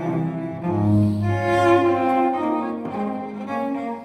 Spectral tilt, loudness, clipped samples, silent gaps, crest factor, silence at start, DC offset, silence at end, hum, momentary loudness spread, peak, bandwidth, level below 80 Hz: -8 dB/octave; -21 LUFS; under 0.1%; none; 16 dB; 0 s; under 0.1%; 0 s; none; 10 LU; -6 dBFS; 11 kHz; -52 dBFS